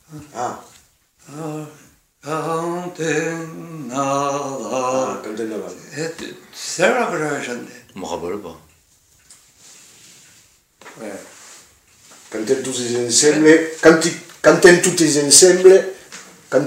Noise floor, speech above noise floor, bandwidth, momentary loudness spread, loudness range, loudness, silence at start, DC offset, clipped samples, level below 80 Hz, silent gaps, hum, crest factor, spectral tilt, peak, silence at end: -55 dBFS; 38 dB; 16 kHz; 23 LU; 18 LU; -16 LUFS; 0.1 s; under 0.1%; under 0.1%; -60 dBFS; none; none; 18 dB; -3 dB/octave; 0 dBFS; 0 s